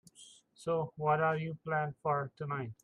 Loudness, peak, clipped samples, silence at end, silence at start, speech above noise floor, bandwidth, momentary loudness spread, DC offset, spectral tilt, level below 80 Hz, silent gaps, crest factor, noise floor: -35 LUFS; -18 dBFS; under 0.1%; 0.1 s; 0.2 s; 25 dB; 11 kHz; 9 LU; under 0.1%; -7 dB/octave; -74 dBFS; none; 16 dB; -59 dBFS